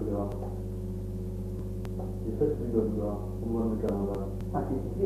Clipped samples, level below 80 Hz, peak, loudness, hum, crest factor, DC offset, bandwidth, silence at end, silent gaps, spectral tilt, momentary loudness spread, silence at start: under 0.1%; -40 dBFS; -14 dBFS; -33 LUFS; 50 Hz at -40 dBFS; 16 dB; under 0.1%; 14 kHz; 0 s; none; -9.5 dB/octave; 7 LU; 0 s